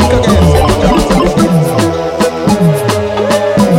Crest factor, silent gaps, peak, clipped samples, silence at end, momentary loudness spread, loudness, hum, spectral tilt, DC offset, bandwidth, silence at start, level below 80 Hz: 8 dB; none; 0 dBFS; 0.1%; 0 s; 5 LU; -10 LUFS; none; -6 dB/octave; under 0.1%; 16.5 kHz; 0 s; -20 dBFS